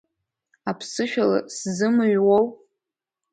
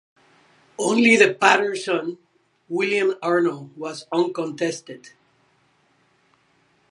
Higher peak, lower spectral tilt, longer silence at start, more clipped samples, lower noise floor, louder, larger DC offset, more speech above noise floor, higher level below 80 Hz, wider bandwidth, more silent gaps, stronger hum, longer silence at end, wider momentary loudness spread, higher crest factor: second, -8 dBFS vs 0 dBFS; about the same, -5 dB/octave vs -4 dB/octave; second, 0.65 s vs 0.8 s; neither; first, -86 dBFS vs -63 dBFS; about the same, -22 LUFS vs -20 LUFS; neither; first, 65 dB vs 42 dB; first, -68 dBFS vs -74 dBFS; second, 9.4 kHz vs 11.5 kHz; neither; neither; second, 0.8 s vs 1.95 s; second, 12 LU vs 19 LU; second, 16 dB vs 24 dB